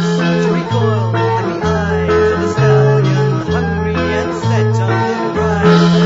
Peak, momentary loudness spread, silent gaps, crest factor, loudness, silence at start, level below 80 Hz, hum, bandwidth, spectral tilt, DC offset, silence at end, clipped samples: 0 dBFS; 6 LU; none; 12 dB; -14 LUFS; 0 s; -34 dBFS; none; 7.8 kHz; -7 dB/octave; under 0.1%; 0 s; under 0.1%